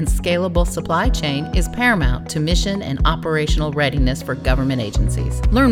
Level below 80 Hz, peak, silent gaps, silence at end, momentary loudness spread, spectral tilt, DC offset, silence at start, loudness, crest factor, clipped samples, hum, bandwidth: -22 dBFS; -2 dBFS; none; 0 s; 4 LU; -5.5 dB/octave; under 0.1%; 0 s; -19 LUFS; 14 dB; under 0.1%; none; 15 kHz